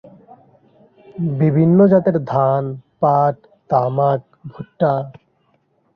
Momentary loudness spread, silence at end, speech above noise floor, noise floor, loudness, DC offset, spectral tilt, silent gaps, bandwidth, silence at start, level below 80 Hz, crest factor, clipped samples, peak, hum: 22 LU; 0.85 s; 46 dB; -62 dBFS; -17 LUFS; under 0.1%; -11.5 dB/octave; none; 5.4 kHz; 1.15 s; -58 dBFS; 16 dB; under 0.1%; -2 dBFS; none